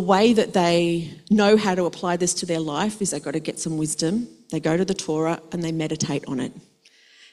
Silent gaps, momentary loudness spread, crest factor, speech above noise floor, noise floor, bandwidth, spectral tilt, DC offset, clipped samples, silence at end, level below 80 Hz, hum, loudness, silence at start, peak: none; 11 LU; 18 dB; 33 dB; -55 dBFS; 13.5 kHz; -4.5 dB/octave; under 0.1%; under 0.1%; 0.7 s; -58 dBFS; none; -23 LUFS; 0 s; -4 dBFS